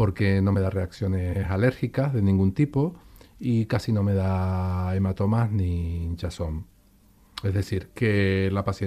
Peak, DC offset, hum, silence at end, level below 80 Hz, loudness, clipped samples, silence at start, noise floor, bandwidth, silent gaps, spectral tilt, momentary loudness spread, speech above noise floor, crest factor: -10 dBFS; under 0.1%; none; 0 s; -42 dBFS; -25 LUFS; under 0.1%; 0 s; -57 dBFS; 11 kHz; none; -8 dB/octave; 9 LU; 33 dB; 14 dB